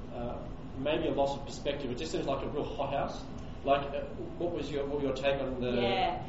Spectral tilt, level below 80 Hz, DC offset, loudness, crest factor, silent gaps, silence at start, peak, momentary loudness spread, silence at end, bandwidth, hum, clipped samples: -4.5 dB/octave; -48 dBFS; 0.5%; -34 LUFS; 18 dB; none; 0 s; -16 dBFS; 10 LU; 0 s; 8 kHz; none; under 0.1%